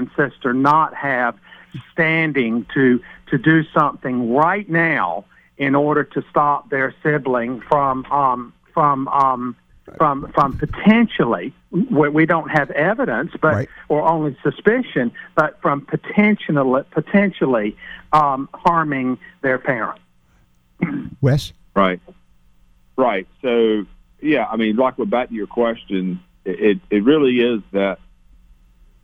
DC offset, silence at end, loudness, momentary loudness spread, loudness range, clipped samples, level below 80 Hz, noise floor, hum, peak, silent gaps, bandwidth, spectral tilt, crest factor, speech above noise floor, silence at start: under 0.1%; 1.1 s; -18 LUFS; 9 LU; 4 LU; under 0.1%; -48 dBFS; -56 dBFS; none; -2 dBFS; none; 11.5 kHz; -8 dB/octave; 18 dB; 38 dB; 0 s